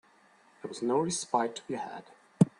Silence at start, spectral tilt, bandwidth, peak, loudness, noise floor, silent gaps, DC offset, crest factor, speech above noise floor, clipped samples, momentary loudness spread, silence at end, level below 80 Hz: 0.65 s; -5.5 dB/octave; 11.5 kHz; -8 dBFS; -32 LUFS; -63 dBFS; none; under 0.1%; 24 dB; 30 dB; under 0.1%; 15 LU; 0.1 s; -72 dBFS